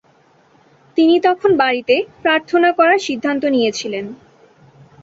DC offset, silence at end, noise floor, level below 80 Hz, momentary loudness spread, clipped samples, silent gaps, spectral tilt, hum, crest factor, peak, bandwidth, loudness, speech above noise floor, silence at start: under 0.1%; 0.9 s; -53 dBFS; -60 dBFS; 11 LU; under 0.1%; none; -4 dB/octave; none; 16 dB; -2 dBFS; 7.8 kHz; -16 LUFS; 38 dB; 0.95 s